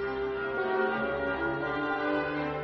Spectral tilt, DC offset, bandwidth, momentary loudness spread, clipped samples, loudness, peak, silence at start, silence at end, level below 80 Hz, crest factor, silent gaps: -3.5 dB/octave; under 0.1%; 6.2 kHz; 3 LU; under 0.1%; -30 LUFS; -16 dBFS; 0 s; 0 s; -54 dBFS; 14 dB; none